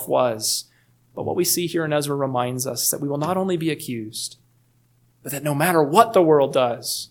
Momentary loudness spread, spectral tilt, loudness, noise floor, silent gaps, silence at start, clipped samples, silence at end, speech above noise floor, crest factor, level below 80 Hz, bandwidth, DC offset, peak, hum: 14 LU; -4 dB/octave; -21 LUFS; -60 dBFS; none; 0 s; under 0.1%; 0.05 s; 40 dB; 22 dB; -68 dBFS; 19 kHz; under 0.1%; 0 dBFS; none